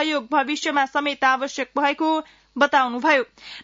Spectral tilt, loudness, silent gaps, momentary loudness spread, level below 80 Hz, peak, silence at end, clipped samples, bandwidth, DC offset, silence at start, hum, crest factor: -2 dB/octave; -21 LUFS; none; 7 LU; -66 dBFS; -6 dBFS; 0 s; under 0.1%; 7.8 kHz; under 0.1%; 0 s; none; 16 dB